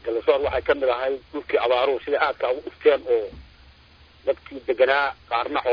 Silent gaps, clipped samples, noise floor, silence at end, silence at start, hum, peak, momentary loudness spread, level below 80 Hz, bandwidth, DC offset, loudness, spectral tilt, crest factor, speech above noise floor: none; under 0.1%; -52 dBFS; 0 s; 0.05 s; none; -6 dBFS; 9 LU; -50 dBFS; 5.2 kHz; under 0.1%; -23 LUFS; -6 dB/octave; 18 dB; 29 dB